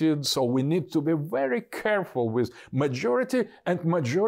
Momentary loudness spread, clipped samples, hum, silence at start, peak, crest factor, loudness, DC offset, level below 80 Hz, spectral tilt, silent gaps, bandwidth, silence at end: 4 LU; under 0.1%; none; 0 s; -14 dBFS; 10 dB; -26 LUFS; under 0.1%; -68 dBFS; -6 dB/octave; none; 16 kHz; 0 s